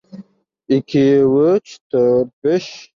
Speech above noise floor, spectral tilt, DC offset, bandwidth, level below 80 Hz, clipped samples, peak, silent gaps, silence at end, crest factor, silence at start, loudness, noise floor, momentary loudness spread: 28 dB; -7.5 dB/octave; under 0.1%; 7.4 kHz; -58 dBFS; under 0.1%; -4 dBFS; 1.81-1.90 s, 2.33-2.42 s; 0.2 s; 12 dB; 0.15 s; -16 LUFS; -43 dBFS; 7 LU